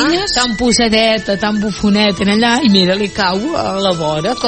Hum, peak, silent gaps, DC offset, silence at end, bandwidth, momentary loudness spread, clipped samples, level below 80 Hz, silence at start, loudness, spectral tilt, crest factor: none; 0 dBFS; none; under 0.1%; 0 s; 8.8 kHz; 6 LU; under 0.1%; -38 dBFS; 0 s; -13 LUFS; -4 dB/octave; 14 dB